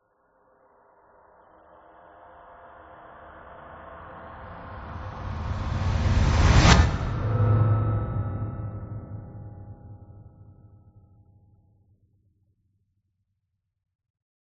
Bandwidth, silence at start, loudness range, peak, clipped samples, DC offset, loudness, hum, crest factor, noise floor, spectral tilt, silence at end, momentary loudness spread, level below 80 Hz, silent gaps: 7.6 kHz; 2.65 s; 23 LU; -2 dBFS; under 0.1%; under 0.1%; -24 LUFS; none; 26 dB; -79 dBFS; -5.5 dB/octave; 4.15 s; 27 LU; -34 dBFS; none